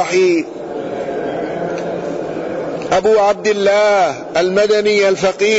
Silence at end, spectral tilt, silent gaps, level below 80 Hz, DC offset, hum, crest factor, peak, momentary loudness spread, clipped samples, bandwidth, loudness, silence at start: 0 s; -4 dB/octave; none; -52 dBFS; under 0.1%; none; 10 dB; -4 dBFS; 10 LU; under 0.1%; 8 kHz; -15 LUFS; 0 s